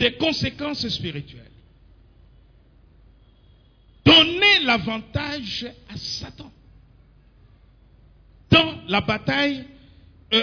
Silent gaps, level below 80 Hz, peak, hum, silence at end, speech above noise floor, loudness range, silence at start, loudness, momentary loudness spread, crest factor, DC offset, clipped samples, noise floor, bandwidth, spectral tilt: none; -48 dBFS; -4 dBFS; none; 0 s; 29 dB; 14 LU; 0 s; -19 LUFS; 19 LU; 20 dB; under 0.1%; under 0.1%; -54 dBFS; 5.4 kHz; -4.5 dB/octave